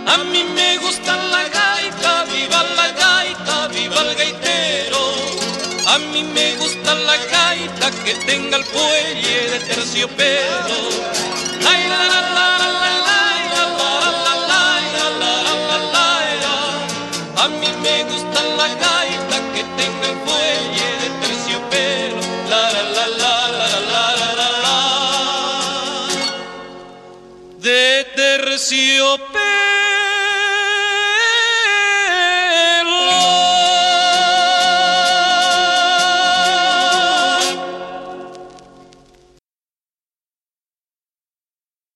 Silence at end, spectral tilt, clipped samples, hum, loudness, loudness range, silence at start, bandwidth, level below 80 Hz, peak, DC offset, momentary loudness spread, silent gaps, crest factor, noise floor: 3.35 s; -1 dB/octave; under 0.1%; none; -14 LUFS; 5 LU; 0 s; 13 kHz; -58 dBFS; 0 dBFS; under 0.1%; 7 LU; none; 16 dB; under -90 dBFS